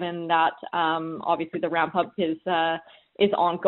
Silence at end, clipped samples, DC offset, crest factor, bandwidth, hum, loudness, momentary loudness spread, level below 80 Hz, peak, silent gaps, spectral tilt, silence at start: 0 s; under 0.1%; under 0.1%; 18 dB; 4.2 kHz; none; -25 LUFS; 5 LU; -66 dBFS; -8 dBFS; none; -2.5 dB/octave; 0 s